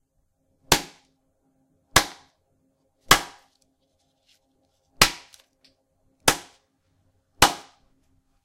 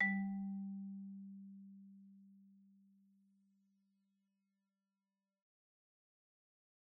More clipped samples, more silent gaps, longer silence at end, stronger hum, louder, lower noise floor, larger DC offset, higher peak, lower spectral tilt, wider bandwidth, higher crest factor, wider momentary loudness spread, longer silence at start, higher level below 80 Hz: neither; neither; second, 0.85 s vs 4.3 s; neither; first, -21 LUFS vs -45 LUFS; second, -71 dBFS vs under -90 dBFS; neither; first, 0 dBFS vs -26 dBFS; second, -1.5 dB/octave vs -3.5 dB/octave; first, 16 kHz vs 2.2 kHz; about the same, 28 dB vs 24 dB; second, 20 LU vs 23 LU; first, 0.7 s vs 0 s; first, -44 dBFS vs -88 dBFS